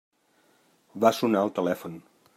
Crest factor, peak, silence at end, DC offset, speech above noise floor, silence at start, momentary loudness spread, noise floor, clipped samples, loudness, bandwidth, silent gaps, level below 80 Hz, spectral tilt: 20 dB; -8 dBFS; 0.4 s; under 0.1%; 40 dB; 0.95 s; 22 LU; -65 dBFS; under 0.1%; -25 LUFS; 16 kHz; none; -78 dBFS; -5.5 dB/octave